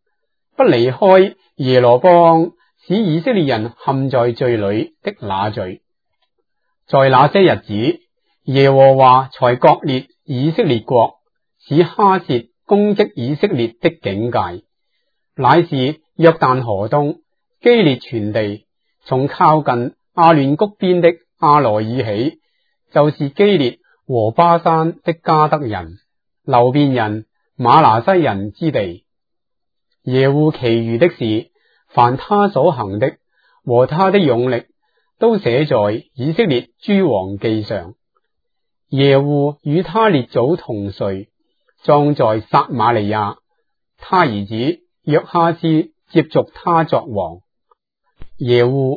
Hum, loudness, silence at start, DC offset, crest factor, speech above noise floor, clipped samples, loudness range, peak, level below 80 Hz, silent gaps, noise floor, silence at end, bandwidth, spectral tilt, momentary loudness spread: none; -15 LUFS; 0.6 s; under 0.1%; 16 dB; 67 dB; under 0.1%; 5 LU; 0 dBFS; -54 dBFS; none; -81 dBFS; 0 s; 5 kHz; -9.5 dB/octave; 12 LU